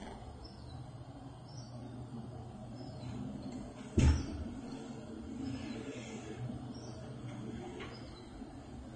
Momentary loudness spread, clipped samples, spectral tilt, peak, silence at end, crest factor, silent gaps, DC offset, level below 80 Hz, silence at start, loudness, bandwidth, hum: 12 LU; under 0.1%; -6.5 dB/octave; -16 dBFS; 0 s; 24 dB; none; under 0.1%; -46 dBFS; 0 s; -42 LUFS; 9.6 kHz; none